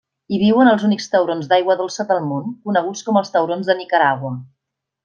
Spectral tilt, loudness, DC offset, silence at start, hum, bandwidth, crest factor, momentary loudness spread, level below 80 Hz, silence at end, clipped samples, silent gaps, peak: -5.5 dB/octave; -18 LUFS; under 0.1%; 0.3 s; none; 7.4 kHz; 16 dB; 11 LU; -64 dBFS; 0.6 s; under 0.1%; none; -2 dBFS